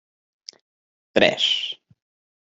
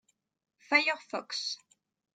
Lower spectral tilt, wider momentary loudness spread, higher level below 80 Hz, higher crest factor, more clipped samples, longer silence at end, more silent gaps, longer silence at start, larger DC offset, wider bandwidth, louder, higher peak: first, -3 dB/octave vs -0.5 dB/octave; first, 25 LU vs 11 LU; first, -64 dBFS vs -90 dBFS; about the same, 24 dB vs 26 dB; neither; first, 0.75 s vs 0.6 s; neither; first, 1.15 s vs 0.7 s; neither; second, 8 kHz vs 9.4 kHz; first, -20 LUFS vs -30 LUFS; first, -2 dBFS vs -10 dBFS